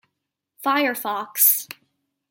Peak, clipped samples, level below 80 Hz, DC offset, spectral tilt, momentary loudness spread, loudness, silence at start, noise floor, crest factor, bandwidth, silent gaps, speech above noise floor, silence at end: -4 dBFS; under 0.1%; -82 dBFS; under 0.1%; -0.5 dB/octave; 12 LU; -20 LUFS; 0.6 s; -80 dBFS; 22 dB; 17 kHz; none; 59 dB; 0.65 s